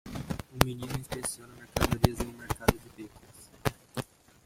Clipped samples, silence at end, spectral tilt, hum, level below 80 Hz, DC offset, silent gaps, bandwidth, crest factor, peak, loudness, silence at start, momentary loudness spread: under 0.1%; 0.4 s; -5 dB/octave; none; -44 dBFS; under 0.1%; none; 16.5 kHz; 32 dB; 0 dBFS; -32 LUFS; 0.05 s; 19 LU